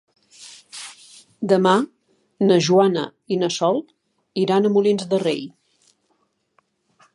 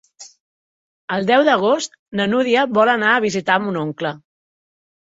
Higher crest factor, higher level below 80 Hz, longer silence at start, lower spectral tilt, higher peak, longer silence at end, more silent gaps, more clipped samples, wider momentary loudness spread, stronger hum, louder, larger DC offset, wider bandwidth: about the same, 20 dB vs 18 dB; second, -72 dBFS vs -64 dBFS; first, 0.4 s vs 0.2 s; about the same, -5.5 dB/octave vs -4.5 dB/octave; about the same, -2 dBFS vs -2 dBFS; first, 1.65 s vs 0.85 s; second, none vs 0.40-1.08 s, 1.99-2.06 s; neither; first, 20 LU vs 11 LU; neither; second, -20 LUFS vs -17 LUFS; neither; first, 11.5 kHz vs 8 kHz